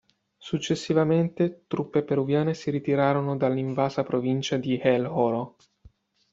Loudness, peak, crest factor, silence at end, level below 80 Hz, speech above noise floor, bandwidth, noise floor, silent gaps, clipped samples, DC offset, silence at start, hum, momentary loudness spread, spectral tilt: -26 LUFS; -8 dBFS; 18 dB; 0.85 s; -64 dBFS; 32 dB; 7.8 kHz; -57 dBFS; none; under 0.1%; under 0.1%; 0.4 s; none; 7 LU; -7 dB/octave